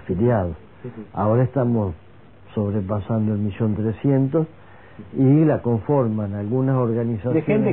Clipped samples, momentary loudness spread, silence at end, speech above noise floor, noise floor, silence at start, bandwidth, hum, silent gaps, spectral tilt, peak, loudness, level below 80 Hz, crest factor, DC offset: under 0.1%; 12 LU; 0 s; 27 dB; -47 dBFS; 0 s; 3.8 kHz; none; none; -13.5 dB/octave; -6 dBFS; -21 LUFS; -50 dBFS; 14 dB; 0.4%